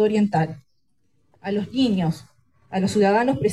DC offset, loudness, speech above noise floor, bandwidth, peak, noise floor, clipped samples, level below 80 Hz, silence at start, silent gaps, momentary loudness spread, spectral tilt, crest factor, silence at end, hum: under 0.1%; -22 LUFS; 52 dB; 12 kHz; -6 dBFS; -72 dBFS; under 0.1%; -56 dBFS; 0 s; none; 14 LU; -6.5 dB/octave; 16 dB; 0 s; none